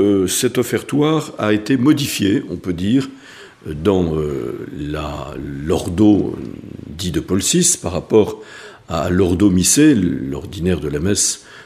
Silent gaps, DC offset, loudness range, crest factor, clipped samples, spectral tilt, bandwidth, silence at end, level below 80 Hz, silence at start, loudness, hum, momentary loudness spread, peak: none; under 0.1%; 5 LU; 18 dB; under 0.1%; -4.5 dB/octave; 15.5 kHz; 0 s; -40 dBFS; 0 s; -17 LUFS; none; 14 LU; 0 dBFS